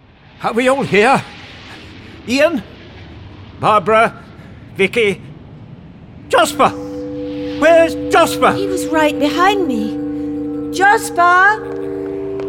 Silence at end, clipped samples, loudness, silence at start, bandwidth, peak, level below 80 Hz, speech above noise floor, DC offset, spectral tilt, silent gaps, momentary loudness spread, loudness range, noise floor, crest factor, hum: 0 s; under 0.1%; -14 LUFS; 0.4 s; 17 kHz; -2 dBFS; -44 dBFS; 23 dB; under 0.1%; -4.5 dB/octave; none; 21 LU; 4 LU; -36 dBFS; 14 dB; none